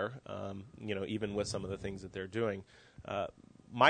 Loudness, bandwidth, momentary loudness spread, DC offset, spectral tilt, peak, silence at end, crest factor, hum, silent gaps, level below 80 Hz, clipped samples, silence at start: -40 LUFS; 9.6 kHz; 9 LU; under 0.1%; -5 dB/octave; -10 dBFS; 0 s; 26 dB; none; none; -62 dBFS; under 0.1%; 0 s